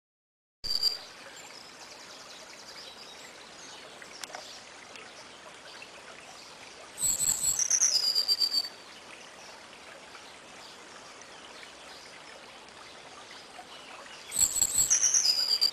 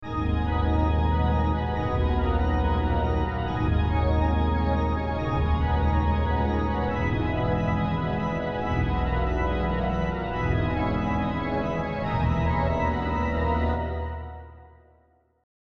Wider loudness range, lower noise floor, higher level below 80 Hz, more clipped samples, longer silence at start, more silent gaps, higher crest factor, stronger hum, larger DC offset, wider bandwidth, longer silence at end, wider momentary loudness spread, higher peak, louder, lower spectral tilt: first, 20 LU vs 2 LU; second, -49 dBFS vs -62 dBFS; second, -64 dBFS vs -30 dBFS; neither; first, 0.65 s vs 0 s; neither; first, 24 dB vs 14 dB; neither; second, under 0.1% vs 0.7%; first, 13 kHz vs 6.2 kHz; second, 0 s vs 0.2 s; first, 24 LU vs 4 LU; about the same, -10 dBFS vs -12 dBFS; about the same, -25 LUFS vs -26 LUFS; second, 1.5 dB/octave vs -9 dB/octave